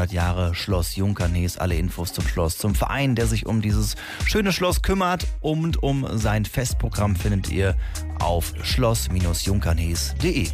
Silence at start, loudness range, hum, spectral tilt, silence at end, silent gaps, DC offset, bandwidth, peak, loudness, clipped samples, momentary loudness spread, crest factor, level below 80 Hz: 0 s; 1 LU; none; -5 dB/octave; 0 s; none; under 0.1%; 15.5 kHz; -10 dBFS; -23 LUFS; under 0.1%; 4 LU; 12 dB; -28 dBFS